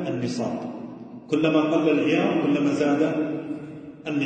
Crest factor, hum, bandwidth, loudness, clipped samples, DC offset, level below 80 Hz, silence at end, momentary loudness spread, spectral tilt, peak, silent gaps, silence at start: 16 dB; none; 9 kHz; -23 LUFS; under 0.1%; under 0.1%; -66 dBFS; 0 s; 16 LU; -6.5 dB/octave; -8 dBFS; none; 0 s